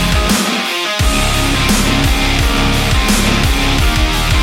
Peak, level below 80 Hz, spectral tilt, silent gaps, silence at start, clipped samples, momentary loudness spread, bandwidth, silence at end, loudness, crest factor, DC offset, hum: -2 dBFS; -16 dBFS; -3.5 dB/octave; none; 0 s; under 0.1%; 2 LU; 16.5 kHz; 0 s; -13 LUFS; 12 dB; under 0.1%; none